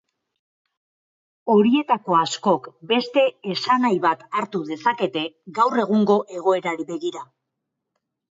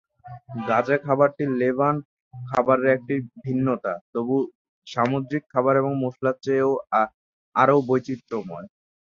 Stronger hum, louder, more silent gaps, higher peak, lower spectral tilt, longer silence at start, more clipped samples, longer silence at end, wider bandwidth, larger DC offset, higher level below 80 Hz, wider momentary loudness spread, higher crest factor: neither; about the same, -21 LUFS vs -23 LUFS; second, none vs 2.05-2.31 s, 4.01-4.13 s, 4.55-4.82 s, 7.14-7.52 s; about the same, -6 dBFS vs -4 dBFS; second, -5 dB/octave vs -8 dB/octave; first, 1.45 s vs 0.25 s; neither; first, 1.1 s vs 0.4 s; about the same, 7.8 kHz vs 7.2 kHz; neither; second, -72 dBFS vs -66 dBFS; about the same, 10 LU vs 12 LU; about the same, 18 dB vs 20 dB